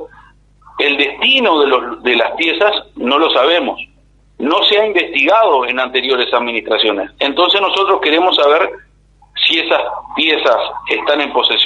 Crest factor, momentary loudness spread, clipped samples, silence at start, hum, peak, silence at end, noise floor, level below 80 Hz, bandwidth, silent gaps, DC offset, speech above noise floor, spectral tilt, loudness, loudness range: 14 dB; 7 LU; under 0.1%; 0 s; 50 Hz at -50 dBFS; 0 dBFS; 0 s; -45 dBFS; -52 dBFS; 8.6 kHz; none; under 0.1%; 32 dB; -3 dB/octave; -13 LUFS; 1 LU